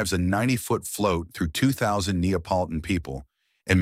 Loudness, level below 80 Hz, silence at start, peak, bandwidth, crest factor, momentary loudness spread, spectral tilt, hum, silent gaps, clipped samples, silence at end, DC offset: -25 LUFS; -42 dBFS; 0 s; -4 dBFS; 16 kHz; 20 dB; 6 LU; -5.5 dB/octave; none; none; under 0.1%; 0 s; under 0.1%